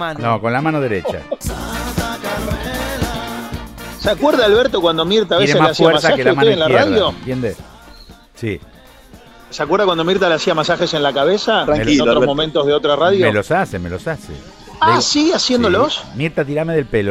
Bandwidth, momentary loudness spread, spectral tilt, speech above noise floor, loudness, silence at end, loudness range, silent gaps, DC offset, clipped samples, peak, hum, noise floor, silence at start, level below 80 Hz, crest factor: 16 kHz; 13 LU; -4.5 dB/octave; 27 dB; -15 LUFS; 0 s; 7 LU; none; under 0.1%; under 0.1%; 0 dBFS; none; -41 dBFS; 0 s; -36 dBFS; 16 dB